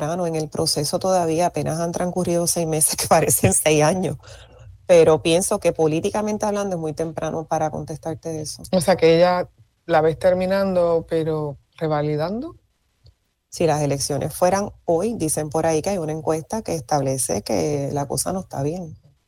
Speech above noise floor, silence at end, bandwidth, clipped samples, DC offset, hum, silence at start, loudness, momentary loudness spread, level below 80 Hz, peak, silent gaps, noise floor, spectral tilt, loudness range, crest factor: 36 dB; 0.3 s; 20 kHz; under 0.1%; under 0.1%; none; 0 s; -21 LUFS; 12 LU; -48 dBFS; -4 dBFS; none; -56 dBFS; -4.5 dB/octave; 6 LU; 18 dB